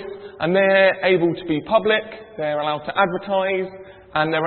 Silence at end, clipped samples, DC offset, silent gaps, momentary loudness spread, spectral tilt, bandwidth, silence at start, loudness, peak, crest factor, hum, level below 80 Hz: 0 s; under 0.1%; under 0.1%; none; 11 LU; -10.5 dB/octave; 4.4 kHz; 0 s; -20 LUFS; -4 dBFS; 18 dB; none; -58 dBFS